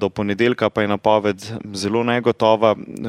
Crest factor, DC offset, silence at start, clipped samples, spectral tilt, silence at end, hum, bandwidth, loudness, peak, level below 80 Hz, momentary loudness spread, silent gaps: 18 dB; under 0.1%; 0 s; under 0.1%; -5.5 dB/octave; 0 s; none; 13.5 kHz; -18 LUFS; -2 dBFS; -56 dBFS; 8 LU; none